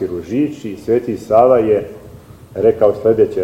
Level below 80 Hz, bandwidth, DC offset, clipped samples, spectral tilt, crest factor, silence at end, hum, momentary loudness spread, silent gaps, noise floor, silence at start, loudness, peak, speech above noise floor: -46 dBFS; 13.5 kHz; under 0.1%; under 0.1%; -8 dB/octave; 16 dB; 0 s; none; 11 LU; none; -38 dBFS; 0 s; -15 LUFS; 0 dBFS; 23 dB